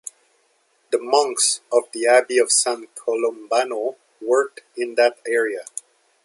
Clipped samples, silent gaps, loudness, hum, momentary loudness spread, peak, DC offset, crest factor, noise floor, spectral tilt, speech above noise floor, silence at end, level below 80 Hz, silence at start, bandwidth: under 0.1%; none; -20 LUFS; none; 13 LU; -2 dBFS; under 0.1%; 18 dB; -64 dBFS; 0.5 dB/octave; 43 dB; 0.6 s; -82 dBFS; 0.9 s; 11.5 kHz